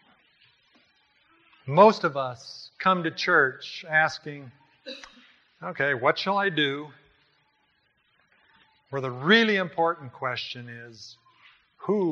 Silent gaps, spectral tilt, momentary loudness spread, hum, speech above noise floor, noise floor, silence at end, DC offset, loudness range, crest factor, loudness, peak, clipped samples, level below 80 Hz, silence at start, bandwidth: none; -5.5 dB/octave; 23 LU; none; 44 dB; -69 dBFS; 0 s; under 0.1%; 5 LU; 24 dB; -24 LUFS; -4 dBFS; under 0.1%; -76 dBFS; 1.65 s; 7.6 kHz